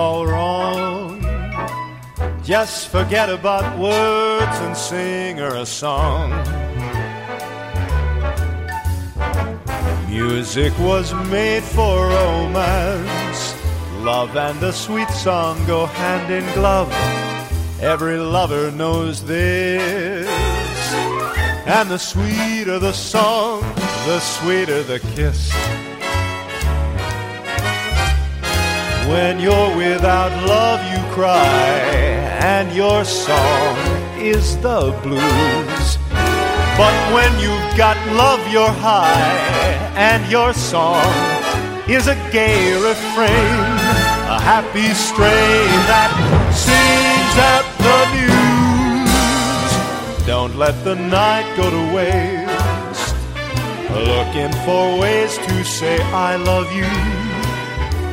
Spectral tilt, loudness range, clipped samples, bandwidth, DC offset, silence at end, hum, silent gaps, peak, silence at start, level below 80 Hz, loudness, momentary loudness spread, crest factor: -4.5 dB/octave; 8 LU; under 0.1%; 16.5 kHz; under 0.1%; 0 s; none; none; 0 dBFS; 0 s; -26 dBFS; -16 LUFS; 10 LU; 16 dB